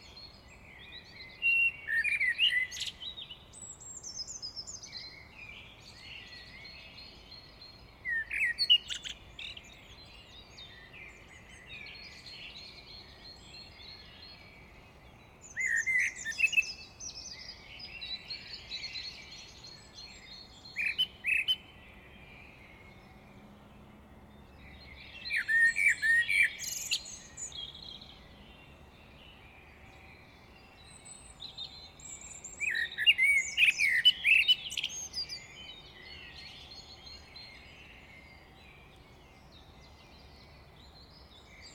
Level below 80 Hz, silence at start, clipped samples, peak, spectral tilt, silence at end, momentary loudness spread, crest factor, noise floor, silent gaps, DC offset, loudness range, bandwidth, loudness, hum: -60 dBFS; 0 s; under 0.1%; -14 dBFS; 0.5 dB/octave; 0 s; 27 LU; 22 dB; -56 dBFS; none; under 0.1%; 22 LU; 18 kHz; -29 LUFS; none